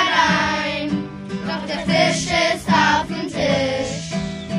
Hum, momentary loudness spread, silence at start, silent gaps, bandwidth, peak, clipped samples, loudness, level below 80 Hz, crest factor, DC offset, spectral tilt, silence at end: none; 10 LU; 0 s; none; 12.5 kHz; -2 dBFS; under 0.1%; -19 LUFS; -44 dBFS; 18 dB; under 0.1%; -4 dB/octave; 0 s